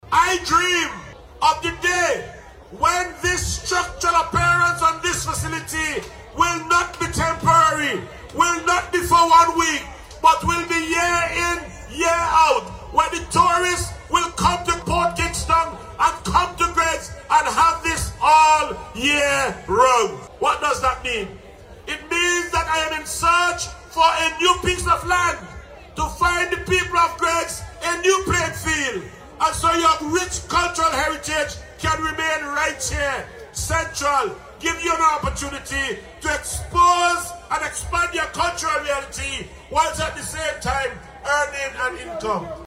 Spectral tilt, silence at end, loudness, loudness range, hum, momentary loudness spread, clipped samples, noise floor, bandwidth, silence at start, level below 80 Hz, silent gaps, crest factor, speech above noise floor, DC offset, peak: -2.5 dB/octave; 0 s; -20 LUFS; 5 LU; none; 11 LU; under 0.1%; -42 dBFS; 16 kHz; 0.05 s; -38 dBFS; none; 18 dB; 22 dB; under 0.1%; -2 dBFS